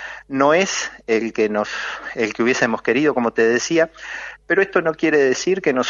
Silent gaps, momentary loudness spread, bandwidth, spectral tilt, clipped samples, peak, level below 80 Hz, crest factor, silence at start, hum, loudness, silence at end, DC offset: none; 9 LU; 7.6 kHz; -4 dB/octave; under 0.1%; -2 dBFS; -56 dBFS; 16 dB; 0 s; none; -19 LUFS; 0 s; under 0.1%